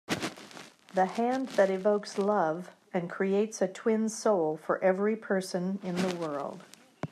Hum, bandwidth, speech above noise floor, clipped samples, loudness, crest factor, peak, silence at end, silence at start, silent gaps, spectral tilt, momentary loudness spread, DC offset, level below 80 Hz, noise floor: none; 14 kHz; 21 dB; under 0.1%; -30 LUFS; 18 dB; -12 dBFS; 0.05 s; 0.1 s; none; -5.5 dB/octave; 11 LU; under 0.1%; -78 dBFS; -50 dBFS